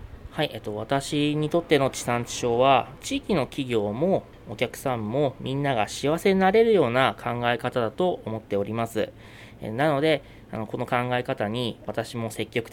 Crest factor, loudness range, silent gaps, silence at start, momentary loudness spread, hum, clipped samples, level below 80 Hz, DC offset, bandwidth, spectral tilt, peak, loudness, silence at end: 20 dB; 4 LU; none; 0 s; 12 LU; none; under 0.1%; -52 dBFS; under 0.1%; 17.5 kHz; -5.5 dB/octave; -4 dBFS; -25 LUFS; 0 s